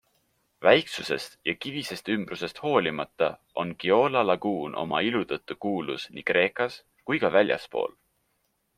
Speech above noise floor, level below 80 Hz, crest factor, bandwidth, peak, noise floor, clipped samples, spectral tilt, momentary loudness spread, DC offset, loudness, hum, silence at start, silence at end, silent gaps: 47 dB; -66 dBFS; 24 dB; 15 kHz; -4 dBFS; -74 dBFS; under 0.1%; -5 dB/octave; 11 LU; under 0.1%; -27 LUFS; none; 0.6 s; 0.9 s; none